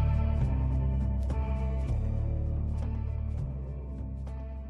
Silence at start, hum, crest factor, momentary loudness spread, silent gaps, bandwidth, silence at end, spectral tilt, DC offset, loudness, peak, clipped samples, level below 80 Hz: 0 s; none; 12 dB; 10 LU; none; 3.5 kHz; 0 s; -10 dB/octave; under 0.1%; -32 LUFS; -18 dBFS; under 0.1%; -32 dBFS